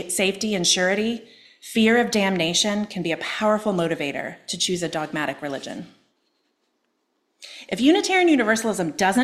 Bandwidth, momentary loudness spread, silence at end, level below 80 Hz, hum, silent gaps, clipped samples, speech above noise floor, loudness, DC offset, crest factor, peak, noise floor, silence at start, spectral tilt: 15 kHz; 13 LU; 0 s; -62 dBFS; none; none; under 0.1%; 50 dB; -21 LUFS; under 0.1%; 18 dB; -6 dBFS; -72 dBFS; 0 s; -3.5 dB/octave